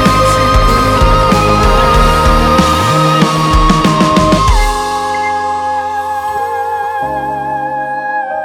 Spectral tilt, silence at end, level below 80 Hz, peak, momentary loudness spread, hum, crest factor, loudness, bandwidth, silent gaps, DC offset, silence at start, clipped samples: -5 dB/octave; 0 s; -18 dBFS; 0 dBFS; 8 LU; none; 10 dB; -11 LUFS; 16.5 kHz; none; under 0.1%; 0 s; under 0.1%